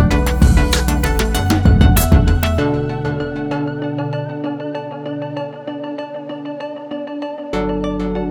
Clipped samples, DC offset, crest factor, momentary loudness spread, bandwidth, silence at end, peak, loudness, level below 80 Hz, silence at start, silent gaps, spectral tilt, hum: under 0.1%; under 0.1%; 16 dB; 14 LU; over 20 kHz; 0 s; -2 dBFS; -18 LUFS; -22 dBFS; 0 s; none; -6 dB/octave; none